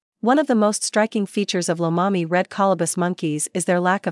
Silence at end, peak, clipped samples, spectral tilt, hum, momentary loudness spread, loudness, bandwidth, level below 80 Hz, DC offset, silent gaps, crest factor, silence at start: 0 s; -6 dBFS; under 0.1%; -4.5 dB/octave; none; 4 LU; -20 LUFS; 12 kHz; -80 dBFS; under 0.1%; none; 16 dB; 0.25 s